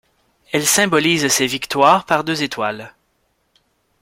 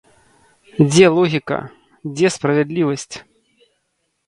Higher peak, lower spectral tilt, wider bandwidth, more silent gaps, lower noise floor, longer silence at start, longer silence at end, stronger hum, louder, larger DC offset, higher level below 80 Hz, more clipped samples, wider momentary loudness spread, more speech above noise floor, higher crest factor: about the same, 0 dBFS vs 0 dBFS; second, -2.5 dB/octave vs -5.5 dB/octave; first, 16.5 kHz vs 11.5 kHz; neither; second, -65 dBFS vs -70 dBFS; second, 0.55 s vs 0.75 s; about the same, 1.1 s vs 1.05 s; neither; about the same, -16 LUFS vs -16 LUFS; neither; about the same, -58 dBFS vs -56 dBFS; neither; second, 10 LU vs 21 LU; second, 49 dB vs 54 dB; about the same, 18 dB vs 18 dB